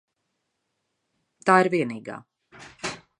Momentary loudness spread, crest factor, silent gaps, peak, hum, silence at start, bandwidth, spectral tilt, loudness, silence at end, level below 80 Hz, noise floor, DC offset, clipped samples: 20 LU; 24 dB; none; -2 dBFS; none; 1.45 s; 11 kHz; -5.5 dB/octave; -23 LUFS; 0.25 s; -68 dBFS; -78 dBFS; under 0.1%; under 0.1%